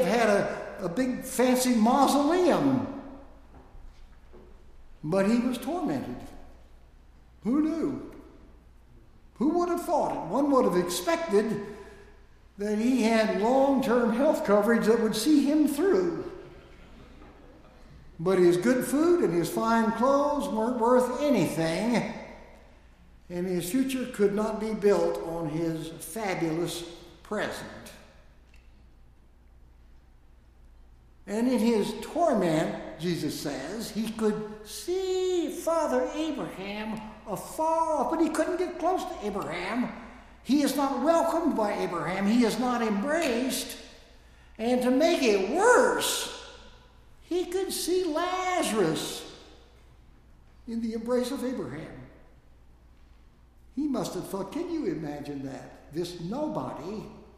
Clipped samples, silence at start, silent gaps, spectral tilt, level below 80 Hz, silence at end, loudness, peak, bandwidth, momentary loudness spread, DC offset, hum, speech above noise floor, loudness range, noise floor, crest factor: under 0.1%; 0 s; none; -5 dB/octave; -54 dBFS; 0.15 s; -27 LUFS; -8 dBFS; 15.5 kHz; 14 LU; under 0.1%; none; 29 dB; 10 LU; -55 dBFS; 20 dB